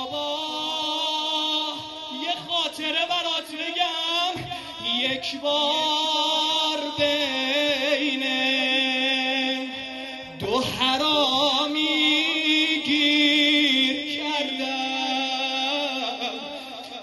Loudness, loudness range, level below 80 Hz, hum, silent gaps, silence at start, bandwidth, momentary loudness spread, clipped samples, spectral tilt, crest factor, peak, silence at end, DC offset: -22 LUFS; 5 LU; -62 dBFS; none; none; 0 s; 12 kHz; 10 LU; under 0.1%; -2 dB/octave; 18 dB; -6 dBFS; 0 s; under 0.1%